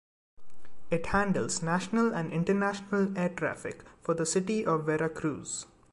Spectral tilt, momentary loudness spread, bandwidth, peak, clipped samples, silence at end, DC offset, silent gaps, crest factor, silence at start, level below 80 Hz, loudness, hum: -5 dB/octave; 9 LU; 11.5 kHz; -14 dBFS; under 0.1%; 0 s; under 0.1%; none; 16 dB; 0.4 s; -56 dBFS; -30 LUFS; none